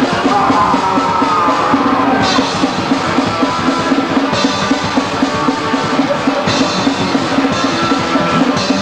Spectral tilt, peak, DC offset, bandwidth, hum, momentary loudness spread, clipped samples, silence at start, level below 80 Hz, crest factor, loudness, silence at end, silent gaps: -4.5 dB/octave; 0 dBFS; under 0.1%; 10.5 kHz; none; 3 LU; under 0.1%; 0 s; -42 dBFS; 12 dB; -13 LUFS; 0 s; none